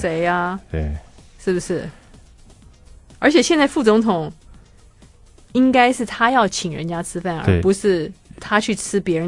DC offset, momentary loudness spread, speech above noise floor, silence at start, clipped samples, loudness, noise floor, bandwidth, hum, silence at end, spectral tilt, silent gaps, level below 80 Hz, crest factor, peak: under 0.1%; 12 LU; 29 dB; 0 s; under 0.1%; -19 LUFS; -47 dBFS; 11.5 kHz; none; 0 s; -5 dB/octave; none; -42 dBFS; 20 dB; 0 dBFS